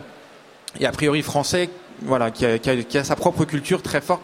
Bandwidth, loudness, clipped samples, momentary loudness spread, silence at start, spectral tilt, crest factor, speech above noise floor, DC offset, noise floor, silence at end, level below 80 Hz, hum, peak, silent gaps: 16 kHz; -22 LUFS; under 0.1%; 7 LU; 0 s; -5 dB/octave; 20 dB; 25 dB; under 0.1%; -46 dBFS; 0 s; -50 dBFS; none; -2 dBFS; none